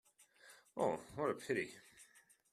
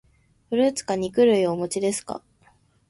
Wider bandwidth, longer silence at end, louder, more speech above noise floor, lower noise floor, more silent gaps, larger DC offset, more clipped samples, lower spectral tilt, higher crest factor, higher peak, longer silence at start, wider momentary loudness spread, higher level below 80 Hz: first, 14 kHz vs 11.5 kHz; second, 0.5 s vs 0.7 s; second, -41 LUFS vs -23 LUFS; second, 28 dB vs 38 dB; first, -68 dBFS vs -60 dBFS; neither; neither; neither; about the same, -5 dB/octave vs -4.5 dB/octave; about the same, 20 dB vs 16 dB; second, -24 dBFS vs -8 dBFS; about the same, 0.45 s vs 0.5 s; first, 22 LU vs 12 LU; second, -78 dBFS vs -60 dBFS